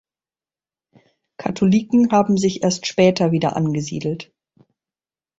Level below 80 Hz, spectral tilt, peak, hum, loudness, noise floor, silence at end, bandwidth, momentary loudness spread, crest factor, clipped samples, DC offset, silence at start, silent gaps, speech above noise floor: -56 dBFS; -6 dB/octave; -2 dBFS; none; -18 LUFS; under -90 dBFS; 1.15 s; 8 kHz; 11 LU; 18 dB; under 0.1%; under 0.1%; 1.4 s; none; over 73 dB